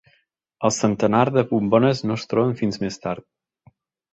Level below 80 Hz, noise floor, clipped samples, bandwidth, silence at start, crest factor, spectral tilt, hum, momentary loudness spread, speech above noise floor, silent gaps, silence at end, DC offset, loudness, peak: -56 dBFS; -65 dBFS; under 0.1%; 8.2 kHz; 0.6 s; 18 dB; -6 dB/octave; none; 10 LU; 45 dB; none; 0.9 s; under 0.1%; -21 LUFS; -4 dBFS